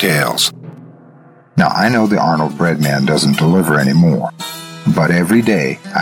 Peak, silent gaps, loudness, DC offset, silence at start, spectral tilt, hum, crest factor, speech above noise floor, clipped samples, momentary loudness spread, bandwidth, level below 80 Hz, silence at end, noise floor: -2 dBFS; none; -13 LUFS; under 0.1%; 0 s; -5.5 dB/octave; none; 12 dB; 30 dB; under 0.1%; 9 LU; 17.5 kHz; -48 dBFS; 0 s; -43 dBFS